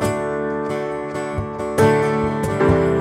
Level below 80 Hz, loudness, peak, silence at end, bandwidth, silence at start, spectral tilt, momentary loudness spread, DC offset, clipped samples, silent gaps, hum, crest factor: -38 dBFS; -20 LUFS; -4 dBFS; 0 s; 15.5 kHz; 0 s; -7 dB/octave; 9 LU; under 0.1%; under 0.1%; none; none; 16 dB